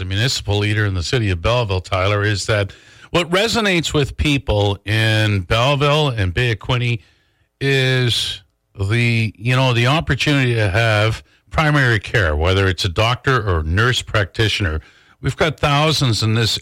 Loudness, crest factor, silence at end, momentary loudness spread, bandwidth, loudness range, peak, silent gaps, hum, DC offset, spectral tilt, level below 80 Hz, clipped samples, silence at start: -17 LUFS; 10 dB; 0 s; 5 LU; 15.5 kHz; 2 LU; -6 dBFS; none; none; under 0.1%; -5 dB/octave; -36 dBFS; under 0.1%; 0 s